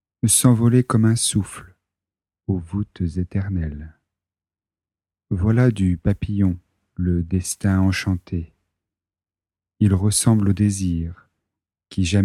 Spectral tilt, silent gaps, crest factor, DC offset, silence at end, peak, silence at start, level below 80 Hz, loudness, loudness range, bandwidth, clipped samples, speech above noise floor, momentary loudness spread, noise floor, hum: -5.5 dB/octave; none; 18 dB; under 0.1%; 0 s; -4 dBFS; 0.25 s; -40 dBFS; -20 LUFS; 8 LU; 15 kHz; under 0.1%; over 71 dB; 14 LU; under -90 dBFS; none